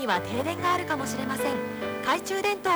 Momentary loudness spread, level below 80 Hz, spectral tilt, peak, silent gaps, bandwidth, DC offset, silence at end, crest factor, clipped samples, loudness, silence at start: 4 LU; -62 dBFS; -4 dB/octave; -14 dBFS; none; over 20 kHz; under 0.1%; 0 s; 14 dB; under 0.1%; -28 LUFS; 0 s